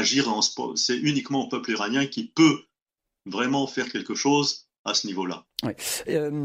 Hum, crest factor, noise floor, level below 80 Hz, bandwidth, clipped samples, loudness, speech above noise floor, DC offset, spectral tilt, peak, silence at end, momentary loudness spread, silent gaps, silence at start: none; 20 dB; -86 dBFS; -68 dBFS; 15.5 kHz; under 0.1%; -25 LUFS; 61 dB; under 0.1%; -3.5 dB/octave; -6 dBFS; 0 s; 11 LU; 2.82-2.86 s, 4.79-4.85 s; 0 s